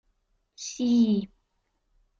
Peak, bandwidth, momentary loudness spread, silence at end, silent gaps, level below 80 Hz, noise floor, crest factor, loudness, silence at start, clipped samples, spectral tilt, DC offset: -14 dBFS; 7.6 kHz; 17 LU; 0.95 s; none; -66 dBFS; -75 dBFS; 16 dB; -25 LUFS; 0.6 s; under 0.1%; -5.5 dB/octave; under 0.1%